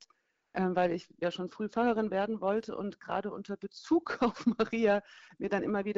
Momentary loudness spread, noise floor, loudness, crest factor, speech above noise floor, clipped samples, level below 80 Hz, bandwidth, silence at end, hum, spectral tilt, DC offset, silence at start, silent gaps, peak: 10 LU; -73 dBFS; -32 LUFS; 16 dB; 41 dB; under 0.1%; -66 dBFS; 7.8 kHz; 0 s; none; -5 dB/octave; under 0.1%; 0.55 s; none; -16 dBFS